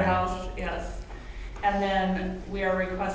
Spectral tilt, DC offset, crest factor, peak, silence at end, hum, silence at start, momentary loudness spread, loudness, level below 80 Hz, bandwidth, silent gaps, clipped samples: -6.5 dB/octave; under 0.1%; 16 dB; -12 dBFS; 0 s; none; 0 s; 16 LU; -29 LUFS; -38 dBFS; 8 kHz; none; under 0.1%